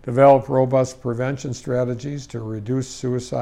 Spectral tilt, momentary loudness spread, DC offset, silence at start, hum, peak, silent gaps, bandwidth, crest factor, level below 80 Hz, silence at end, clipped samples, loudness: -7 dB/octave; 16 LU; under 0.1%; 0.05 s; none; -2 dBFS; none; 10.5 kHz; 18 dB; -52 dBFS; 0 s; under 0.1%; -21 LUFS